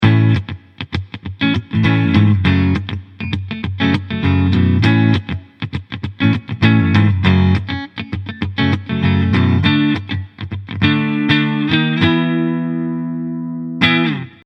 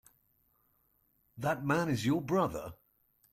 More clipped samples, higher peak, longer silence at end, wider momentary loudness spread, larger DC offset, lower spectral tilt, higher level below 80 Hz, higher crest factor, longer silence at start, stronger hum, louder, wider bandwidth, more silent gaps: neither; first, 0 dBFS vs -16 dBFS; second, 0.15 s vs 0.6 s; first, 13 LU vs 10 LU; neither; first, -8 dB/octave vs -6.5 dB/octave; first, -40 dBFS vs -64 dBFS; about the same, 14 dB vs 18 dB; second, 0 s vs 1.35 s; neither; first, -16 LUFS vs -33 LUFS; second, 6.2 kHz vs 16.5 kHz; neither